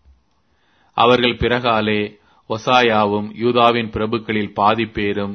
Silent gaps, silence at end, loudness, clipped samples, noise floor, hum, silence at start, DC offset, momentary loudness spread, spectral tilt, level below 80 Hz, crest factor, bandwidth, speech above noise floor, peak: none; 0 s; -17 LUFS; under 0.1%; -63 dBFS; none; 0.95 s; under 0.1%; 8 LU; -6 dB/octave; -44 dBFS; 18 dB; 6.6 kHz; 46 dB; 0 dBFS